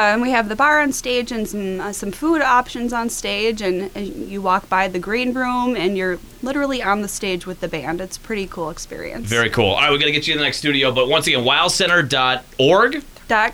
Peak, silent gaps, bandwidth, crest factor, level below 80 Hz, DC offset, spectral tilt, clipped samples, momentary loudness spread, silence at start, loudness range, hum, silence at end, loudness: -2 dBFS; none; over 20 kHz; 16 dB; -42 dBFS; under 0.1%; -3.5 dB/octave; under 0.1%; 12 LU; 0 s; 7 LU; none; 0 s; -18 LUFS